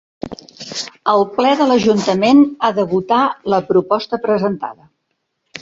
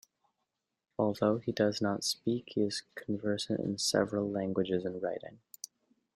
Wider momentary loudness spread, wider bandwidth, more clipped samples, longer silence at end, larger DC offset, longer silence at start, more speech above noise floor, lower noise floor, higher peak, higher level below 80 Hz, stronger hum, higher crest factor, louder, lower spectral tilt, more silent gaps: about the same, 18 LU vs 16 LU; second, 7.8 kHz vs 16.5 kHz; neither; second, 0.05 s vs 0.8 s; neither; second, 0.25 s vs 1 s; first, 56 dB vs 52 dB; second, -71 dBFS vs -85 dBFS; first, 0 dBFS vs -14 dBFS; first, -56 dBFS vs -72 dBFS; neither; about the same, 16 dB vs 20 dB; first, -15 LUFS vs -33 LUFS; about the same, -5.5 dB/octave vs -4.5 dB/octave; neither